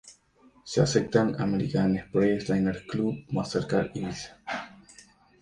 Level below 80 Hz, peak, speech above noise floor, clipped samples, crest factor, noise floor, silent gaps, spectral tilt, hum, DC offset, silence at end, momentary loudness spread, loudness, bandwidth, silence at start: -54 dBFS; -6 dBFS; 33 dB; under 0.1%; 20 dB; -60 dBFS; none; -6 dB/octave; none; under 0.1%; 0.6 s; 11 LU; -28 LUFS; 10.5 kHz; 0.05 s